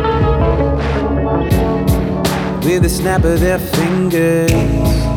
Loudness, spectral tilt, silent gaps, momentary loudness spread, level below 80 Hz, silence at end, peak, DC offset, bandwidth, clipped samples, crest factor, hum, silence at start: -14 LUFS; -6.5 dB/octave; none; 3 LU; -22 dBFS; 0 s; 0 dBFS; under 0.1%; over 20 kHz; under 0.1%; 12 dB; none; 0 s